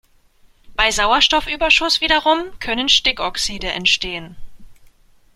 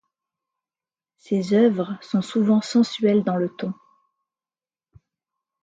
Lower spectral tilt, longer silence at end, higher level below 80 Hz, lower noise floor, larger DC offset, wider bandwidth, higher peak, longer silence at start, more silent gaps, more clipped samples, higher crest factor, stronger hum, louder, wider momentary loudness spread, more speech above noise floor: second, -1 dB/octave vs -7 dB/octave; second, 0.6 s vs 1.9 s; first, -38 dBFS vs -70 dBFS; second, -52 dBFS vs under -90 dBFS; neither; first, 16 kHz vs 7.8 kHz; first, 0 dBFS vs -6 dBFS; second, 0.7 s vs 1.3 s; neither; neither; about the same, 20 dB vs 18 dB; neither; first, -16 LUFS vs -22 LUFS; about the same, 9 LU vs 10 LU; second, 35 dB vs over 69 dB